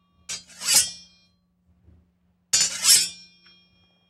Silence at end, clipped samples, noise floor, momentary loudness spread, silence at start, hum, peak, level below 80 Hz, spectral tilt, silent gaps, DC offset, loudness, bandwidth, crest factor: 0.95 s; under 0.1%; -66 dBFS; 19 LU; 0.3 s; none; -2 dBFS; -64 dBFS; 2.5 dB/octave; none; under 0.1%; -19 LUFS; 16 kHz; 24 dB